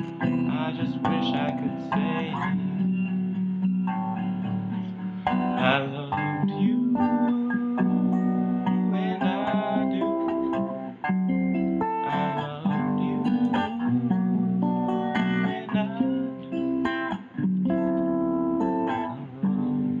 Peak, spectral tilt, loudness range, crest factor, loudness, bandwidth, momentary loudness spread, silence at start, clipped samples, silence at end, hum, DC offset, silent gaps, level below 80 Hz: -6 dBFS; -9 dB/octave; 2 LU; 20 dB; -26 LUFS; 4.8 kHz; 6 LU; 0 s; under 0.1%; 0 s; none; under 0.1%; none; -60 dBFS